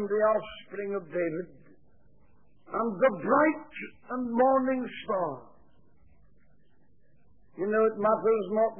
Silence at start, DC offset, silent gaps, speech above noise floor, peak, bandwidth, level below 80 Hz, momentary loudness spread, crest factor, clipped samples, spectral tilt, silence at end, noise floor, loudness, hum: 0 s; 0.2%; none; 39 dB; -12 dBFS; 3.5 kHz; -68 dBFS; 14 LU; 18 dB; under 0.1%; -10 dB/octave; 0 s; -67 dBFS; -28 LUFS; none